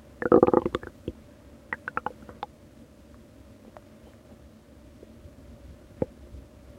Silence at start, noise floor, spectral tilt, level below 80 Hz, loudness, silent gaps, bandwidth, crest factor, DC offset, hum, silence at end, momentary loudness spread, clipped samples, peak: 0.25 s; -51 dBFS; -8 dB/octave; -52 dBFS; -26 LUFS; none; 13 kHz; 30 dB; under 0.1%; none; 0.4 s; 29 LU; under 0.1%; -2 dBFS